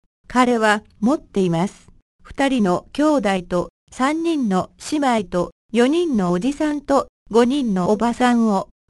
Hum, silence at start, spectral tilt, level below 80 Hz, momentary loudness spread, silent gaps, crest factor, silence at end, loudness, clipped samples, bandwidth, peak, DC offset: none; 0.3 s; -6 dB/octave; -48 dBFS; 6 LU; 2.02-2.19 s, 3.70-3.87 s, 5.52-5.69 s, 7.09-7.26 s; 18 dB; 0.25 s; -19 LUFS; under 0.1%; 12 kHz; -2 dBFS; under 0.1%